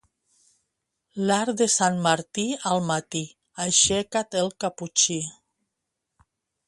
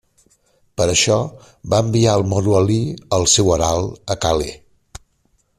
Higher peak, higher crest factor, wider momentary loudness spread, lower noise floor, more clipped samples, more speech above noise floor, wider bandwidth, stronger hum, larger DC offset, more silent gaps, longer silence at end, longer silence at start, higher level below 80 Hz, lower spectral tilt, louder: second, -6 dBFS vs -2 dBFS; first, 22 dB vs 16 dB; about the same, 12 LU vs 10 LU; first, -82 dBFS vs -62 dBFS; neither; first, 58 dB vs 46 dB; second, 11.5 kHz vs 13.5 kHz; neither; neither; neither; first, 1.35 s vs 0.6 s; first, 1.15 s vs 0.8 s; second, -60 dBFS vs -40 dBFS; second, -2.5 dB/octave vs -4.5 dB/octave; second, -23 LUFS vs -17 LUFS